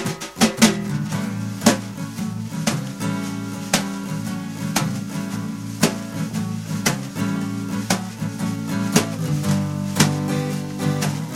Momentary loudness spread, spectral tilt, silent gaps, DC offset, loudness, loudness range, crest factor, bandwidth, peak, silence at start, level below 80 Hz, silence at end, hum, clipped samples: 9 LU; -4.5 dB/octave; none; under 0.1%; -23 LUFS; 3 LU; 22 dB; 16.5 kHz; -2 dBFS; 0 s; -54 dBFS; 0 s; none; under 0.1%